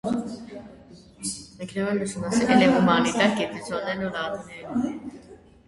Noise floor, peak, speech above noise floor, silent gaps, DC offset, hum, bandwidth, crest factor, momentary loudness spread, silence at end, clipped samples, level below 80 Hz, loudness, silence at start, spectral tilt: -48 dBFS; -4 dBFS; 25 dB; none; under 0.1%; none; 11.5 kHz; 20 dB; 19 LU; 0.3 s; under 0.1%; -56 dBFS; -24 LUFS; 0.05 s; -5 dB/octave